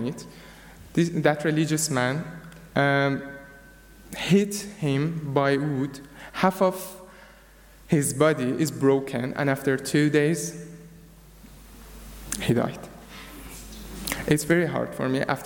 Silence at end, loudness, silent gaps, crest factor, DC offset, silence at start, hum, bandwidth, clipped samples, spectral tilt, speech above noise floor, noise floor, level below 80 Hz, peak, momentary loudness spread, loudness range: 0 s; -25 LUFS; none; 20 dB; under 0.1%; 0 s; none; 17.5 kHz; under 0.1%; -5.5 dB/octave; 27 dB; -51 dBFS; -50 dBFS; -6 dBFS; 20 LU; 6 LU